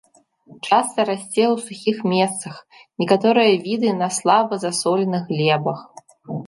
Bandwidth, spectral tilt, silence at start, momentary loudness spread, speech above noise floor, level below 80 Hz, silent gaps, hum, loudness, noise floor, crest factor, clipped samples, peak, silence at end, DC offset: 11.5 kHz; -4.5 dB/octave; 0.5 s; 13 LU; 31 dB; -70 dBFS; none; none; -19 LUFS; -50 dBFS; 18 dB; under 0.1%; -2 dBFS; 0 s; under 0.1%